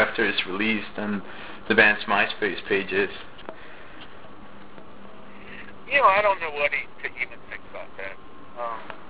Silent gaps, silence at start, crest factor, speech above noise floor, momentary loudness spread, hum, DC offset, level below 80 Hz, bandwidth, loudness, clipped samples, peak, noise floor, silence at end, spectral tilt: none; 0 s; 24 dB; 21 dB; 25 LU; none; 1%; -56 dBFS; 4 kHz; -23 LUFS; under 0.1%; -2 dBFS; -46 dBFS; 0 s; -7.5 dB/octave